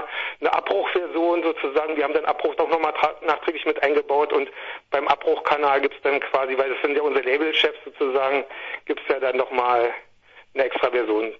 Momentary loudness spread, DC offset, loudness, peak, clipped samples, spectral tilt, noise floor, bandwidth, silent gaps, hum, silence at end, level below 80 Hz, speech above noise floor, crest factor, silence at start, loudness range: 6 LU; under 0.1%; -22 LUFS; -2 dBFS; under 0.1%; -4.5 dB/octave; -50 dBFS; 7 kHz; none; none; 0 s; -64 dBFS; 28 dB; 20 dB; 0 s; 2 LU